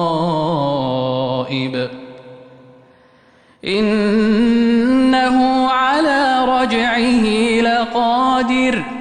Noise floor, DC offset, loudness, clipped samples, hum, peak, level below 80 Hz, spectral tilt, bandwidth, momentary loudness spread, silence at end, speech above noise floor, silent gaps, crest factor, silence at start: -50 dBFS; under 0.1%; -15 LUFS; under 0.1%; none; -6 dBFS; -46 dBFS; -5.5 dB/octave; 10 kHz; 7 LU; 0 s; 34 dB; none; 10 dB; 0 s